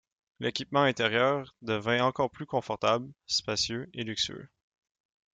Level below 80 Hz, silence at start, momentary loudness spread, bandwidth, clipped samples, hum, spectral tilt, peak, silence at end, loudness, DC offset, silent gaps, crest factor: -66 dBFS; 0.4 s; 8 LU; 9.4 kHz; under 0.1%; none; -4 dB/octave; -10 dBFS; 0.9 s; -29 LUFS; under 0.1%; none; 20 dB